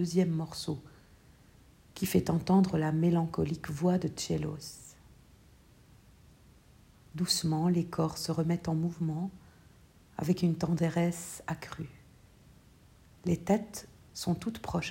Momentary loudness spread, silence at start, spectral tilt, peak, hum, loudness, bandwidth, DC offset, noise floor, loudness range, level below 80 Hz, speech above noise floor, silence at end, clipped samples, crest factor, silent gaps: 16 LU; 0 s; -6 dB/octave; -12 dBFS; none; -32 LUFS; 16 kHz; under 0.1%; -59 dBFS; 7 LU; -58 dBFS; 29 dB; 0 s; under 0.1%; 20 dB; none